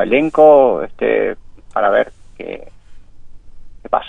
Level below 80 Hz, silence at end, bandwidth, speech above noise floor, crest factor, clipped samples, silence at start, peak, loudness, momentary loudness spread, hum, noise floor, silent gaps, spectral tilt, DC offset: -42 dBFS; 0 s; 3.9 kHz; 22 dB; 16 dB; under 0.1%; 0 s; 0 dBFS; -14 LUFS; 22 LU; none; -35 dBFS; none; -7 dB/octave; 0.4%